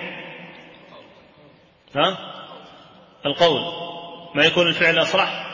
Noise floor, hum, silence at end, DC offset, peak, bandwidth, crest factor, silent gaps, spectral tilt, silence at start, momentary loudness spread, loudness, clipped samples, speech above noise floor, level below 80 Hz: -52 dBFS; none; 0 s; under 0.1%; -2 dBFS; 7.4 kHz; 20 dB; none; -4 dB/octave; 0 s; 21 LU; -19 LUFS; under 0.1%; 32 dB; -62 dBFS